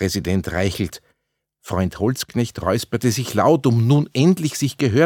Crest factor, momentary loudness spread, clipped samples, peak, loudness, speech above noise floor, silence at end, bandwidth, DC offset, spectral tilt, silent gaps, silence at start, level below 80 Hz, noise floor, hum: 16 dB; 8 LU; under 0.1%; -2 dBFS; -20 LUFS; 57 dB; 0 s; 18 kHz; under 0.1%; -6 dB/octave; none; 0 s; -48 dBFS; -76 dBFS; none